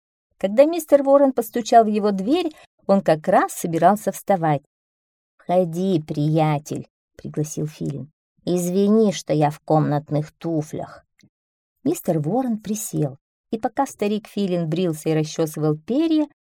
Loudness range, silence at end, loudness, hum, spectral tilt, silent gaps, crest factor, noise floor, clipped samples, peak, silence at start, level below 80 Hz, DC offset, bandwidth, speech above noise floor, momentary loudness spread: 7 LU; 0.25 s; -21 LUFS; none; -6.5 dB/octave; 2.67-2.78 s, 4.66-5.38 s, 6.90-7.08 s, 8.13-8.36 s, 11.29-11.76 s, 13.21-13.44 s; 18 dB; under -90 dBFS; under 0.1%; -2 dBFS; 0.45 s; -62 dBFS; under 0.1%; 18.5 kHz; over 70 dB; 12 LU